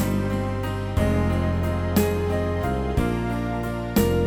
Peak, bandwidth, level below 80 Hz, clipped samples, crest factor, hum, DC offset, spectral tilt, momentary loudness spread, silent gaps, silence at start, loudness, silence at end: -8 dBFS; over 20 kHz; -32 dBFS; under 0.1%; 16 dB; none; under 0.1%; -7 dB/octave; 5 LU; none; 0 s; -24 LUFS; 0 s